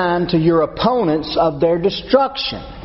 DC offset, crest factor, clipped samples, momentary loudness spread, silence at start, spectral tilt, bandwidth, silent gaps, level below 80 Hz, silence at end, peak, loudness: under 0.1%; 16 dB; under 0.1%; 4 LU; 0 s; -4.5 dB/octave; 6 kHz; none; -40 dBFS; 0 s; 0 dBFS; -17 LUFS